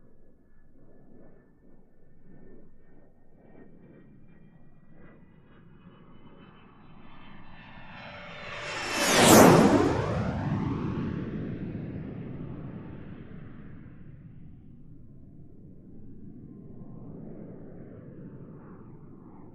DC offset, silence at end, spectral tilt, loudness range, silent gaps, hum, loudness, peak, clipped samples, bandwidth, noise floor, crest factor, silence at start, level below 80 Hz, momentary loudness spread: under 0.1%; 0.05 s; -4.5 dB/octave; 26 LU; none; none; -24 LUFS; -2 dBFS; under 0.1%; 13 kHz; -53 dBFS; 28 dB; 0.15 s; -52 dBFS; 29 LU